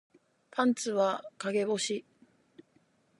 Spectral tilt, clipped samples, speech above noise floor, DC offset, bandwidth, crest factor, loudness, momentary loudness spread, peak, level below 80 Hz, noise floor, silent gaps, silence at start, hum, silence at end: -3.5 dB/octave; under 0.1%; 39 dB; under 0.1%; 11.5 kHz; 22 dB; -31 LUFS; 8 LU; -12 dBFS; -86 dBFS; -69 dBFS; none; 0.55 s; none; 1.2 s